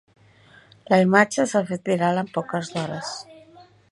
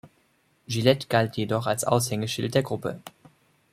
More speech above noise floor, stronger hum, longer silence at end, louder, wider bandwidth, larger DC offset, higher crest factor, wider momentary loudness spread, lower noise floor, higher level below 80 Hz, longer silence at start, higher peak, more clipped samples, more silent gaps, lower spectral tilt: second, 31 dB vs 41 dB; neither; second, 0.3 s vs 0.65 s; first, -22 LUFS vs -25 LUFS; second, 11.5 kHz vs 15.5 kHz; neither; about the same, 22 dB vs 22 dB; first, 13 LU vs 9 LU; second, -53 dBFS vs -66 dBFS; second, -68 dBFS vs -62 dBFS; first, 0.9 s vs 0.05 s; first, 0 dBFS vs -4 dBFS; neither; neither; about the same, -5.5 dB/octave vs -5 dB/octave